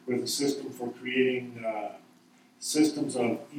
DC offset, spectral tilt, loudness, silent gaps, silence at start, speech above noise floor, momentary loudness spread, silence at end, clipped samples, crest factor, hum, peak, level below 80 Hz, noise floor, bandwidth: under 0.1%; -3.5 dB/octave; -30 LUFS; none; 0.05 s; 30 dB; 11 LU; 0 s; under 0.1%; 18 dB; none; -12 dBFS; -84 dBFS; -60 dBFS; 16.5 kHz